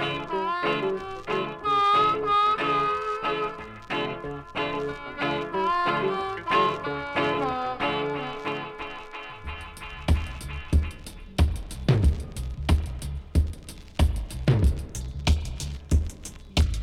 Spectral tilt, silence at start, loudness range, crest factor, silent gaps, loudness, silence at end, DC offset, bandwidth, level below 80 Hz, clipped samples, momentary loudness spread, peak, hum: -6 dB/octave; 0 s; 6 LU; 18 dB; none; -27 LUFS; 0 s; under 0.1%; 13.5 kHz; -32 dBFS; under 0.1%; 13 LU; -8 dBFS; none